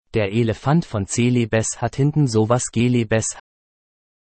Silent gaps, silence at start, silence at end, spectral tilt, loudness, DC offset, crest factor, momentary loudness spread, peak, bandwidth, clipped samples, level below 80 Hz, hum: none; 0.15 s; 1 s; -5.5 dB/octave; -20 LUFS; under 0.1%; 16 dB; 5 LU; -4 dBFS; 8.8 kHz; under 0.1%; -48 dBFS; none